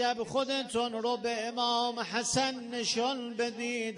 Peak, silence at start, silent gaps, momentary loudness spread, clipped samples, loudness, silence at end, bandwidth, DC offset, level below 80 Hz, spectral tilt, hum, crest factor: -16 dBFS; 0 s; none; 4 LU; under 0.1%; -31 LUFS; 0 s; 11 kHz; under 0.1%; -68 dBFS; -2.5 dB/octave; none; 16 dB